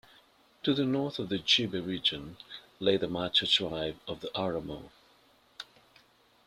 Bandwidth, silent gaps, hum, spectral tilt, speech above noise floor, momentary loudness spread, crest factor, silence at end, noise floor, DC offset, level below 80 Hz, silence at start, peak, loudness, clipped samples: 14 kHz; none; none; -4.5 dB/octave; 33 dB; 21 LU; 22 dB; 0.85 s; -64 dBFS; under 0.1%; -62 dBFS; 0.65 s; -10 dBFS; -30 LUFS; under 0.1%